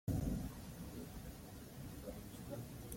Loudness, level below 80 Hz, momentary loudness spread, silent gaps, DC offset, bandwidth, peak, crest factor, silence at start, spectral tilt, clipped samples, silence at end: -48 LUFS; -54 dBFS; 11 LU; none; under 0.1%; 16.5 kHz; -28 dBFS; 18 dB; 0.05 s; -6.5 dB/octave; under 0.1%; 0 s